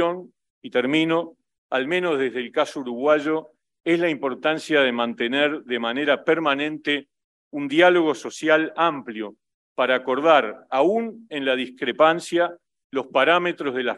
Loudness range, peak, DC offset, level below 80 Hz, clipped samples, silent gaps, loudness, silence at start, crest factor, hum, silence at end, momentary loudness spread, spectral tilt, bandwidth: 2 LU; -2 dBFS; under 0.1%; -76 dBFS; under 0.1%; 0.50-0.62 s, 1.58-1.69 s, 7.24-7.51 s, 9.54-9.76 s, 12.84-12.90 s; -22 LUFS; 0 s; 20 dB; none; 0 s; 11 LU; -4.5 dB/octave; 12 kHz